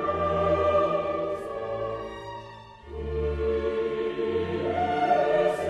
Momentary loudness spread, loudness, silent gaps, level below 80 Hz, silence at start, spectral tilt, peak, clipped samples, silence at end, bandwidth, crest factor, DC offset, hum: 16 LU; -27 LUFS; none; -42 dBFS; 0 s; -7 dB/octave; -12 dBFS; under 0.1%; 0 s; 11.5 kHz; 16 dB; under 0.1%; none